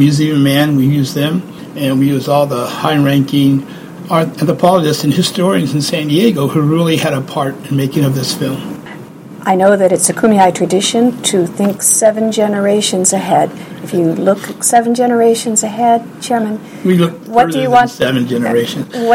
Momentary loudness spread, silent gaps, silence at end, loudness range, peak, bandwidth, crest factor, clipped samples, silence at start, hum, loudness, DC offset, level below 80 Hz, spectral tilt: 8 LU; none; 0 s; 3 LU; 0 dBFS; 17 kHz; 12 dB; under 0.1%; 0 s; none; -12 LUFS; under 0.1%; -52 dBFS; -5 dB/octave